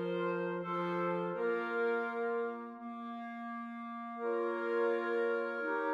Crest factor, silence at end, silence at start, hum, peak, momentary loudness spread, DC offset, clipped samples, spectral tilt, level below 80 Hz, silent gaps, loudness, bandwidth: 12 dB; 0 s; 0 s; none; -22 dBFS; 10 LU; under 0.1%; under 0.1%; -8 dB/octave; under -90 dBFS; none; -36 LUFS; 6.6 kHz